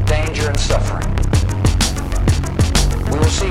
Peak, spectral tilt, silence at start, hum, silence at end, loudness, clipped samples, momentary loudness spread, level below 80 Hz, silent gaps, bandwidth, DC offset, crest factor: 0 dBFS; -5 dB/octave; 0 s; none; 0 s; -17 LUFS; under 0.1%; 3 LU; -20 dBFS; none; 15.5 kHz; 1%; 14 dB